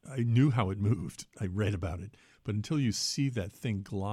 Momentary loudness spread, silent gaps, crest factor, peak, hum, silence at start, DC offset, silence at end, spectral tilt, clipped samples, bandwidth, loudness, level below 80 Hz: 13 LU; none; 16 dB; -14 dBFS; none; 0.05 s; under 0.1%; 0 s; -6 dB/octave; under 0.1%; 13.5 kHz; -31 LUFS; -56 dBFS